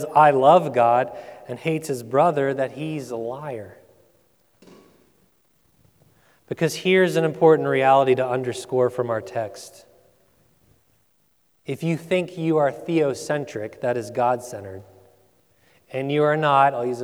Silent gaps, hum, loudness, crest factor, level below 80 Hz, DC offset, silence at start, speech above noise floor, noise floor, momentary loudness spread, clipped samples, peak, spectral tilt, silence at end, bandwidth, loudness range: none; none; -21 LUFS; 20 dB; -70 dBFS; under 0.1%; 0 s; 45 dB; -66 dBFS; 17 LU; under 0.1%; -2 dBFS; -6 dB/octave; 0 s; over 20 kHz; 12 LU